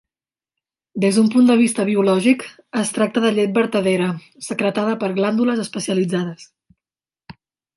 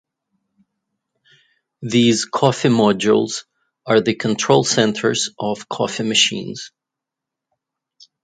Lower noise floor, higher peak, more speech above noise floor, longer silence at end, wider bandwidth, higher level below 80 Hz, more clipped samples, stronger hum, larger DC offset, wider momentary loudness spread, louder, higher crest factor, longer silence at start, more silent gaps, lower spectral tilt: first, under -90 dBFS vs -84 dBFS; second, -4 dBFS vs 0 dBFS; first, over 72 dB vs 67 dB; second, 0.45 s vs 1.55 s; first, 11.5 kHz vs 9.6 kHz; second, -66 dBFS vs -60 dBFS; neither; neither; neither; second, 10 LU vs 14 LU; about the same, -18 LUFS vs -17 LUFS; about the same, 16 dB vs 20 dB; second, 0.95 s vs 1.8 s; neither; first, -5.5 dB/octave vs -4 dB/octave